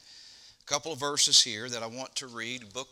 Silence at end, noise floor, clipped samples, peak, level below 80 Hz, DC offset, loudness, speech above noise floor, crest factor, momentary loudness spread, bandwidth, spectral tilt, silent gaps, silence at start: 0.05 s; -54 dBFS; under 0.1%; -8 dBFS; -74 dBFS; under 0.1%; -27 LUFS; 24 dB; 24 dB; 16 LU; 17.5 kHz; 0 dB/octave; none; 0.1 s